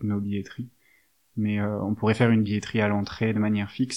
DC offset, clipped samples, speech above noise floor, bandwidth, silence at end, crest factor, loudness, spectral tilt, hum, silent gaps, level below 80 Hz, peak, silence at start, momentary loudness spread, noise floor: 0.1%; under 0.1%; 39 dB; 10.5 kHz; 0 s; 20 dB; -25 LUFS; -7 dB/octave; none; none; -60 dBFS; -6 dBFS; 0 s; 16 LU; -64 dBFS